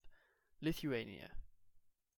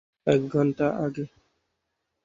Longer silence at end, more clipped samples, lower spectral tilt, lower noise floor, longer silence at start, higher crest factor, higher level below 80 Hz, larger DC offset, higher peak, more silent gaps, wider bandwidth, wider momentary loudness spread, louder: second, 0.3 s vs 1 s; neither; second, -6 dB/octave vs -8 dB/octave; second, -70 dBFS vs -80 dBFS; second, 0.05 s vs 0.25 s; about the same, 18 dB vs 20 dB; about the same, -58 dBFS vs -62 dBFS; neither; second, -28 dBFS vs -6 dBFS; neither; first, 17 kHz vs 7.6 kHz; first, 17 LU vs 12 LU; second, -43 LUFS vs -25 LUFS